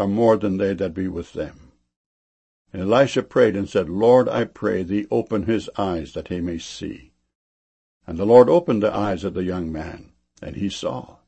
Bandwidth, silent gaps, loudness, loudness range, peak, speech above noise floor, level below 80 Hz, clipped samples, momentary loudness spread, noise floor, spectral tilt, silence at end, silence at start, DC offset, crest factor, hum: 8.6 kHz; 1.96-2.65 s, 7.35-8.01 s; -21 LUFS; 6 LU; 0 dBFS; over 70 dB; -48 dBFS; under 0.1%; 17 LU; under -90 dBFS; -6.5 dB/octave; 0.25 s; 0 s; under 0.1%; 20 dB; none